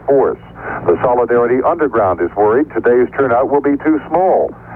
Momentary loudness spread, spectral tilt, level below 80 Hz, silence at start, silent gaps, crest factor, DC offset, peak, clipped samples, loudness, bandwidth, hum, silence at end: 4 LU; -10 dB/octave; -44 dBFS; 0 s; none; 10 dB; under 0.1%; -4 dBFS; under 0.1%; -14 LUFS; 3.6 kHz; none; 0 s